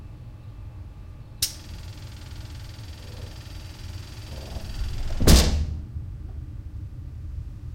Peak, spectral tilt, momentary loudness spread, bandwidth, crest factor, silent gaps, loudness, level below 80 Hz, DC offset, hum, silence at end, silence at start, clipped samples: -2 dBFS; -4.5 dB/octave; 20 LU; 16.5 kHz; 26 dB; none; -28 LUFS; -30 dBFS; under 0.1%; none; 0 s; 0 s; under 0.1%